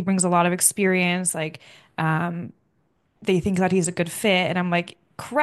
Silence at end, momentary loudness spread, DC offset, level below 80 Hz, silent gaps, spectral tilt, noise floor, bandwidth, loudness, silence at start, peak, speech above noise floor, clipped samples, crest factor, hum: 0 s; 14 LU; under 0.1%; -56 dBFS; none; -4 dB/octave; -68 dBFS; 12.5 kHz; -22 LUFS; 0 s; -2 dBFS; 46 dB; under 0.1%; 22 dB; none